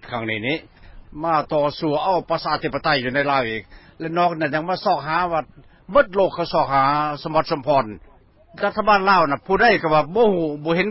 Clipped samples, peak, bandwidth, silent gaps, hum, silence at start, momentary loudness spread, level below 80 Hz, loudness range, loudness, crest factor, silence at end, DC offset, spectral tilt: under 0.1%; -4 dBFS; 5.8 kHz; none; none; 0.05 s; 9 LU; -48 dBFS; 3 LU; -20 LUFS; 16 dB; 0 s; under 0.1%; -9.5 dB/octave